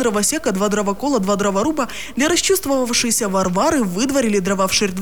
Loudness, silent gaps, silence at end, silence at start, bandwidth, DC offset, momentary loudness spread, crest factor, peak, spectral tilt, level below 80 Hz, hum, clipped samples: -18 LUFS; none; 0 s; 0 s; over 20 kHz; 2%; 3 LU; 14 dB; -4 dBFS; -3.5 dB/octave; -44 dBFS; none; under 0.1%